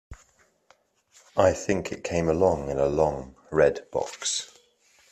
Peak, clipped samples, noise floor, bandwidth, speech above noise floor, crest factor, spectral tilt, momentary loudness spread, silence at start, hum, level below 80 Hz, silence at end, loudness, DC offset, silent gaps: -6 dBFS; under 0.1%; -63 dBFS; 12.5 kHz; 39 dB; 20 dB; -4.5 dB/octave; 9 LU; 0.1 s; none; -50 dBFS; 0.65 s; -25 LUFS; under 0.1%; none